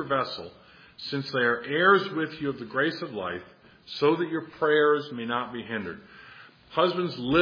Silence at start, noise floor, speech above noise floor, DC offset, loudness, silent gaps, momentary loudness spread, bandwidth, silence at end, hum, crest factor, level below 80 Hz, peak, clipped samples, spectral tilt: 0 s; -50 dBFS; 24 dB; under 0.1%; -26 LUFS; none; 17 LU; 5.2 kHz; 0 s; none; 20 dB; -62 dBFS; -6 dBFS; under 0.1%; -7 dB/octave